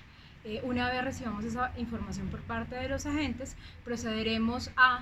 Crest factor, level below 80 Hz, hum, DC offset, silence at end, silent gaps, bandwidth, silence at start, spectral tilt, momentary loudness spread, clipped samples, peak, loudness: 22 dB; -48 dBFS; none; under 0.1%; 0 s; none; 14 kHz; 0 s; -4.5 dB/octave; 10 LU; under 0.1%; -10 dBFS; -33 LUFS